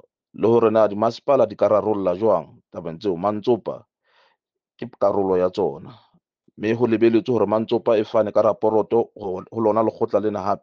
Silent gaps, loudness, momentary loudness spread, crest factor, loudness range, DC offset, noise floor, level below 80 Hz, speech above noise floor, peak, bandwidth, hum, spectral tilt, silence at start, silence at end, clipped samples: none; -20 LUFS; 11 LU; 16 dB; 5 LU; under 0.1%; -72 dBFS; -64 dBFS; 52 dB; -4 dBFS; 7 kHz; none; -8 dB/octave; 0.35 s; 0.05 s; under 0.1%